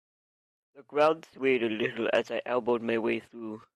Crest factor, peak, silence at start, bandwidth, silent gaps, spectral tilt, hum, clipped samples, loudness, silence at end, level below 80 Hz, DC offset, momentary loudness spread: 18 dB; -12 dBFS; 0.75 s; 11 kHz; none; -5.5 dB/octave; none; under 0.1%; -29 LUFS; 0.15 s; -76 dBFS; under 0.1%; 9 LU